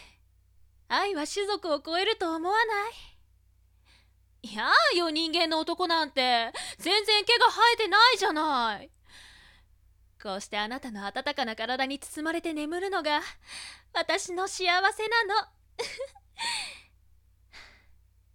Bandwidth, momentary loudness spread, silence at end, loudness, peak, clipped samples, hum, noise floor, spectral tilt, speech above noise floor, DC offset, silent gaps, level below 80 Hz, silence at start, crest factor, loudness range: 17.5 kHz; 16 LU; 0.7 s; -26 LUFS; -8 dBFS; under 0.1%; none; -63 dBFS; -1.5 dB/octave; 35 dB; under 0.1%; none; -62 dBFS; 0 s; 22 dB; 10 LU